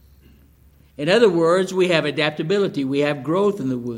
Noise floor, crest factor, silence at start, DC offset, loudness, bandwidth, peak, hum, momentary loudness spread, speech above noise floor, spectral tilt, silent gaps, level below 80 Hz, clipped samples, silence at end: -52 dBFS; 18 dB; 1 s; under 0.1%; -19 LUFS; 15.5 kHz; -2 dBFS; none; 6 LU; 33 dB; -5.5 dB/octave; none; -58 dBFS; under 0.1%; 0 s